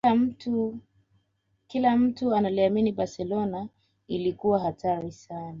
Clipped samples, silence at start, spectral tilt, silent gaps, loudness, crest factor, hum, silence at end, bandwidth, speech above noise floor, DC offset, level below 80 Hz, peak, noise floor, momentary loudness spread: under 0.1%; 0.05 s; -7.5 dB/octave; none; -27 LUFS; 18 dB; none; 0 s; 7.4 kHz; 47 dB; under 0.1%; -62 dBFS; -10 dBFS; -73 dBFS; 14 LU